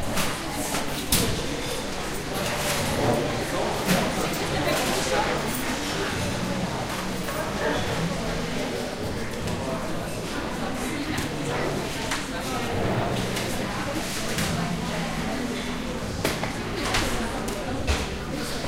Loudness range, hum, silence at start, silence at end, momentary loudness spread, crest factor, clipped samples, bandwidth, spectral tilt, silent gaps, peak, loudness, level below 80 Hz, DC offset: 4 LU; none; 0 s; 0 s; 6 LU; 20 dB; under 0.1%; 16 kHz; -4 dB/octave; none; -6 dBFS; -27 LUFS; -38 dBFS; under 0.1%